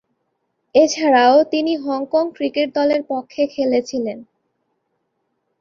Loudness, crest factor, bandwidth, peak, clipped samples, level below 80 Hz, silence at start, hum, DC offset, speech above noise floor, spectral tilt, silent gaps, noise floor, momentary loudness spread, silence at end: -18 LUFS; 18 dB; 7.4 kHz; -2 dBFS; under 0.1%; -62 dBFS; 0.75 s; none; under 0.1%; 55 dB; -3.5 dB/octave; none; -72 dBFS; 12 LU; 1.35 s